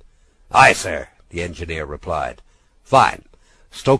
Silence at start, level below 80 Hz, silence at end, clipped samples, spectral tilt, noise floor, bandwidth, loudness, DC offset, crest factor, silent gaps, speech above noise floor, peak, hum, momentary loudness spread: 0.5 s; -42 dBFS; 0 s; under 0.1%; -4 dB/octave; -51 dBFS; 11 kHz; -18 LUFS; under 0.1%; 20 dB; none; 33 dB; 0 dBFS; none; 18 LU